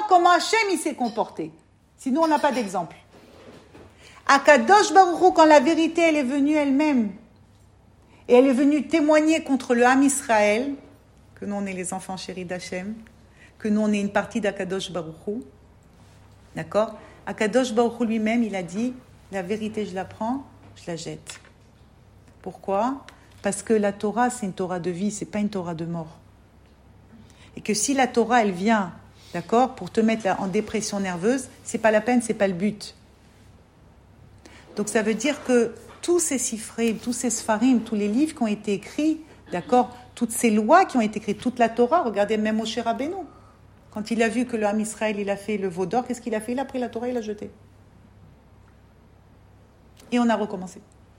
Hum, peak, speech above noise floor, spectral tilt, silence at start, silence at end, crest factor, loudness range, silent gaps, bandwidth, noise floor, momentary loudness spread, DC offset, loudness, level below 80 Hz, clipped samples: none; -2 dBFS; 31 dB; -4.5 dB/octave; 0 s; 0.4 s; 22 dB; 11 LU; none; 16 kHz; -54 dBFS; 17 LU; under 0.1%; -23 LUFS; -58 dBFS; under 0.1%